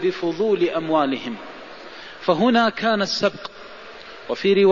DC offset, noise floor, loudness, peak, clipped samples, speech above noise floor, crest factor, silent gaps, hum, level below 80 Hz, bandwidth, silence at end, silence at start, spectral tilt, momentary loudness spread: 0.3%; -40 dBFS; -21 LUFS; -6 dBFS; under 0.1%; 20 dB; 16 dB; none; none; -60 dBFS; 7.4 kHz; 0 s; 0 s; -5.5 dB/octave; 20 LU